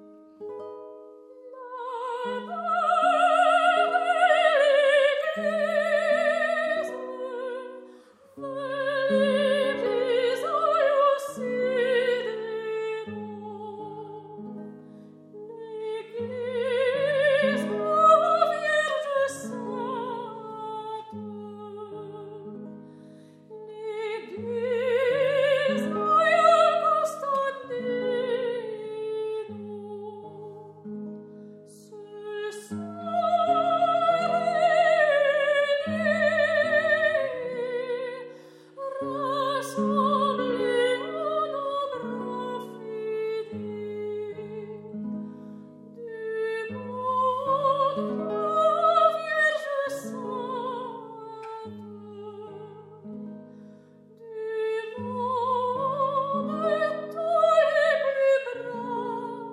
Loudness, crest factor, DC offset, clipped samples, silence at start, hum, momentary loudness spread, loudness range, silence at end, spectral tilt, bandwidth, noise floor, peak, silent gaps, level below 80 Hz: -25 LUFS; 20 dB; under 0.1%; under 0.1%; 0 s; none; 20 LU; 14 LU; 0 s; -4.5 dB/octave; 14 kHz; -52 dBFS; -8 dBFS; none; -82 dBFS